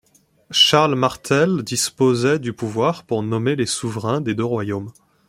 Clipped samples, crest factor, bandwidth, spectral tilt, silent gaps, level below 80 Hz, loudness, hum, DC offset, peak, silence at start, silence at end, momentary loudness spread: under 0.1%; 18 dB; 16.5 kHz; -4 dB/octave; none; -58 dBFS; -19 LUFS; none; under 0.1%; 0 dBFS; 0.5 s; 0.35 s; 10 LU